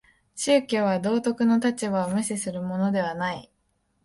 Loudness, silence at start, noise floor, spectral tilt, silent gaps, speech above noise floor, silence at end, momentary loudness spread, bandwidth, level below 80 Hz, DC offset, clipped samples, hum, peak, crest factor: -25 LUFS; 0.35 s; -71 dBFS; -5 dB/octave; none; 47 dB; 0.65 s; 9 LU; 11.5 kHz; -64 dBFS; under 0.1%; under 0.1%; none; -8 dBFS; 16 dB